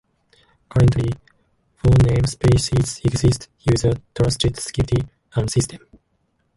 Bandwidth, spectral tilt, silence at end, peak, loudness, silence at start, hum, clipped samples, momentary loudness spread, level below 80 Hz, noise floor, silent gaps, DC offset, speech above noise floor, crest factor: 11.5 kHz; -6 dB/octave; 0.8 s; -4 dBFS; -20 LUFS; 0.75 s; none; under 0.1%; 9 LU; -32 dBFS; -67 dBFS; none; under 0.1%; 49 dB; 14 dB